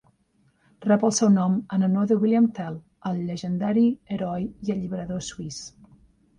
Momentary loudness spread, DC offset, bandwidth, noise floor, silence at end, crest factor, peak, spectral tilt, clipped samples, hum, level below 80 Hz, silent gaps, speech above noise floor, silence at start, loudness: 14 LU; under 0.1%; 11 kHz; -65 dBFS; 0.7 s; 16 dB; -8 dBFS; -6 dB/octave; under 0.1%; none; -58 dBFS; none; 42 dB; 0.8 s; -24 LUFS